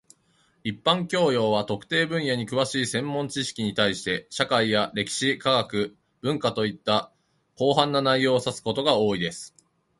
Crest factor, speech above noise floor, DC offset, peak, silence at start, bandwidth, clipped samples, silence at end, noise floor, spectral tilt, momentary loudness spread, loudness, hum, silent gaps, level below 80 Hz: 22 dB; 41 dB; under 0.1%; -2 dBFS; 0.65 s; 11.5 kHz; under 0.1%; 0.5 s; -65 dBFS; -4.5 dB/octave; 7 LU; -24 LUFS; none; none; -62 dBFS